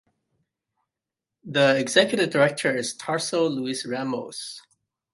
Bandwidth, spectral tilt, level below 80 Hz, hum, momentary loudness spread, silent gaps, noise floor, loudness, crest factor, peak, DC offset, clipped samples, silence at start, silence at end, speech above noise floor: 11.5 kHz; -3.5 dB/octave; -74 dBFS; none; 14 LU; none; -87 dBFS; -23 LUFS; 22 dB; -2 dBFS; under 0.1%; under 0.1%; 1.45 s; 0.55 s; 64 dB